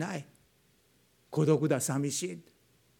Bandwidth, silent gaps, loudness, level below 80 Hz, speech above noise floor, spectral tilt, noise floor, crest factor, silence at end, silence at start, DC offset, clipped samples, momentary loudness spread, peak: 18.5 kHz; none; -31 LUFS; -78 dBFS; 38 dB; -5.5 dB/octave; -68 dBFS; 20 dB; 0.6 s; 0 s; under 0.1%; under 0.1%; 14 LU; -14 dBFS